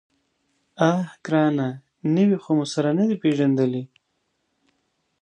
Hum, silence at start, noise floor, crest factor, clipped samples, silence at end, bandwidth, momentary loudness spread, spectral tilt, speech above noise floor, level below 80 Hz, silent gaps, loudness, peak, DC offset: none; 0.8 s; -73 dBFS; 18 dB; under 0.1%; 1.35 s; 9.8 kHz; 9 LU; -7 dB/octave; 52 dB; -72 dBFS; none; -22 LUFS; -4 dBFS; under 0.1%